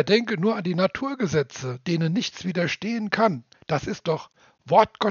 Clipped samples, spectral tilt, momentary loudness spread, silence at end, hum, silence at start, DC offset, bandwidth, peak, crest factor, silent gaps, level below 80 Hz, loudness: under 0.1%; -4.5 dB/octave; 9 LU; 0 s; none; 0 s; under 0.1%; 7.2 kHz; -2 dBFS; 22 dB; none; -60 dBFS; -24 LUFS